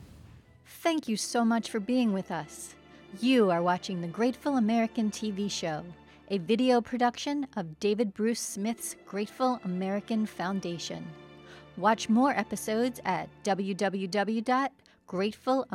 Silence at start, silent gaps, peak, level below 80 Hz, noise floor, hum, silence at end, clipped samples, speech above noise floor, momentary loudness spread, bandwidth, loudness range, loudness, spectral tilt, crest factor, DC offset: 0 s; none; -12 dBFS; -66 dBFS; -54 dBFS; none; 0 s; under 0.1%; 25 dB; 12 LU; 16 kHz; 3 LU; -30 LUFS; -5 dB/octave; 18 dB; under 0.1%